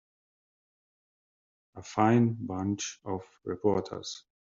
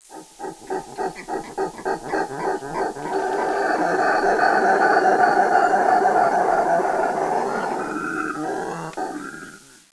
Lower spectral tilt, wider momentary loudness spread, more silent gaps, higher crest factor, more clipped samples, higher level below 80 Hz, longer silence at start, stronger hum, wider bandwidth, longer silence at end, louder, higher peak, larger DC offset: first, -6.5 dB/octave vs -4.5 dB/octave; about the same, 16 LU vs 14 LU; neither; about the same, 22 dB vs 18 dB; neither; second, -70 dBFS vs -54 dBFS; first, 1.75 s vs 0.1 s; neither; second, 7.6 kHz vs 11 kHz; about the same, 0.35 s vs 0.35 s; second, -30 LUFS vs -21 LUFS; second, -10 dBFS vs -2 dBFS; neither